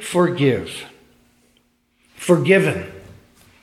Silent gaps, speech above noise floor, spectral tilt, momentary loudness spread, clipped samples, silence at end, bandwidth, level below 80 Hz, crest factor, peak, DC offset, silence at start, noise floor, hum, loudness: none; 45 dB; -6 dB/octave; 20 LU; under 0.1%; 0.6 s; 15 kHz; -56 dBFS; 20 dB; -2 dBFS; under 0.1%; 0 s; -62 dBFS; none; -18 LUFS